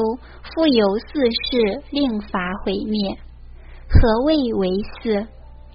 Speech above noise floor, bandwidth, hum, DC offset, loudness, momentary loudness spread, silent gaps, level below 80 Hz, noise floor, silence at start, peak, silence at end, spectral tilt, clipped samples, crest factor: 20 dB; 5.4 kHz; none; under 0.1%; -20 LUFS; 9 LU; none; -28 dBFS; -39 dBFS; 0 s; 0 dBFS; 0.05 s; -5 dB/octave; under 0.1%; 18 dB